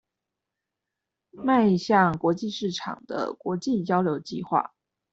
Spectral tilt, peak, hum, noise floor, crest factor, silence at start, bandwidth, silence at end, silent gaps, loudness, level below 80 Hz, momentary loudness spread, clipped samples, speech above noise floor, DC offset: -6.5 dB/octave; -6 dBFS; none; -86 dBFS; 20 dB; 1.35 s; 8 kHz; 0.45 s; none; -25 LUFS; -64 dBFS; 11 LU; under 0.1%; 61 dB; under 0.1%